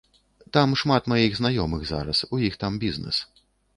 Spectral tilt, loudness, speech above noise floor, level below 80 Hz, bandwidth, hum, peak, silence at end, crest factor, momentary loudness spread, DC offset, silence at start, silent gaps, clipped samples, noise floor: -6 dB/octave; -24 LUFS; 25 dB; -44 dBFS; 11.5 kHz; none; -4 dBFS; 0.55 s; 20 dB; 7 LU; under 0.1%; 0.55 s; none; under 0.1%; -48 dBFS